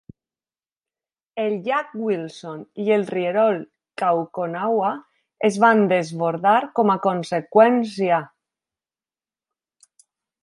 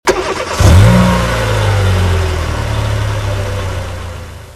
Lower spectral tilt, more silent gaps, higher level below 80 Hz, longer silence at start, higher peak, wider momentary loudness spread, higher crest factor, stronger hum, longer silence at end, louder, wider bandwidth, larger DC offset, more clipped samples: about the same, -6.5 dB/octave vs -5.5 dB/octave; neither; second, -72 dBFS vs -20 dBFS; first, 1.35 s vs 0.05 s; about the same, -2 dBFS vs 0 dBFS; second, 11 LU vs 15 LU; first, 20 dB vs 12 dB; neither; first, 2.15 s vs 0 s; second, -21 LUFS vs -13 LUFS; second, 11.5 kHz vs 13.5 kHz; neither; neither